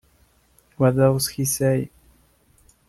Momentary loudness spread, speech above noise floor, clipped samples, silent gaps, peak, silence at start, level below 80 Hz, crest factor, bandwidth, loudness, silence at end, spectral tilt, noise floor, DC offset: 7 LU; 40 dB; under 0.1%; none; -6 dBFS; 0.8 s; -52 dBFS; 18 dB; 13.5 kHz; -21 LUFS; 1.05 s; -5.5 dB/octave; -60 dBFS; under 0.1%